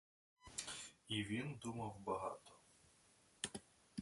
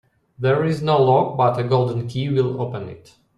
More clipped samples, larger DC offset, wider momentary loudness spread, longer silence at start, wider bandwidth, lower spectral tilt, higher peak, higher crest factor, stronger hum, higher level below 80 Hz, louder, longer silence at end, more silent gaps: neither; neither; about the same, 13 LU vs 11 LU; about the same, 0.4 s vs 0.4 s; about the same, 11.5 kHz vs 10.5 kHz; second, -4 dB/octave vs -8 dB/octave; second, -26 dBFS vs -4 dBFS; first, 24 dB vs 16 dB; neither; second, -74 dBFS vs -56 dBFS; second, -47 LUFS vs -20 LUFS; second, 0 s vs 0.4 s; neither